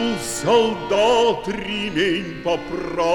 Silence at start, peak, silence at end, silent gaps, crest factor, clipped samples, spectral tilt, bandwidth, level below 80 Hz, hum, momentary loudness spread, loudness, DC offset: 0 s; -6 dBFS; 0 s; none; 14 dB; under 0.1%; -4 dB/octave; 16.5 kHz; -46 dBFS; none; 8 LU; -20 LUFS; under 0.1%